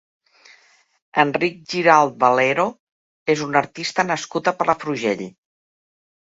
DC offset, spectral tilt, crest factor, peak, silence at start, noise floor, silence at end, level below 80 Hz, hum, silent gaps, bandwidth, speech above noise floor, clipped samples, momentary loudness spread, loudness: under 0.1%; -4.5 dB/octave; 22 dB; 0 dBFS; 1.15 s; -56 dBFS; 1 s; -66 dBFS; none; 2.80-3.26 s; 8 kHz; 37 dB; under 0.1%; 10 LU; -19 LUFS